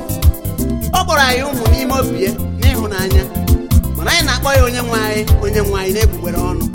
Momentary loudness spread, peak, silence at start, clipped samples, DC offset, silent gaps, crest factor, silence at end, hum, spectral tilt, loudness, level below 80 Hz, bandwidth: 6 LU; 0 dBFS; 0 s; under 0.1%; under 0.1%; none; 14 dB; 0 s; none; -5 dB/octave; -15 LUFS; -20 dBFS; 17 kHz